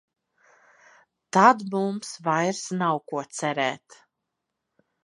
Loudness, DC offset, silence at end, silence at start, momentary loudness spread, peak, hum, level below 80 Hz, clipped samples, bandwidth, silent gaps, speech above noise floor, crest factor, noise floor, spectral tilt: -24 LUFS; under 0.1%; 1.25 s; 1.35 s; 12 LU; -2 dBFS; none; -82 dBFS; under 0.1%; 11.5 kHz; none; 58 dB; 24 dB; -82 dBFS; -4.5 dB/octave